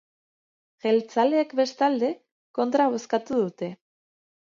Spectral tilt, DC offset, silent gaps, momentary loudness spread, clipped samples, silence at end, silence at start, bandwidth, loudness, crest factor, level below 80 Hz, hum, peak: -5.5 dB/octave; under 0.1%; 2.31-2.54 s; 12 LU; under 0.1%; 0.75 s; 0.85 s; 7.6 kHz; -25 LUFS; 16 dB; -74 dBFS; none; -10 dBFS